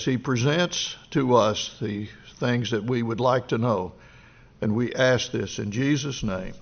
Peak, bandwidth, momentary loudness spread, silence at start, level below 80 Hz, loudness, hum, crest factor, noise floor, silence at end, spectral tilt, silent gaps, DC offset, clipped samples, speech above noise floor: -6 dBFS; 6.8 kHz; 9 LU; 0 s; -52 dBFS; -25 LUFS; none; 18 dB; -51 dBFS; 0.05 s; -4.5 dB/octave; none; under 0.1%; under 0.1%; 26 dB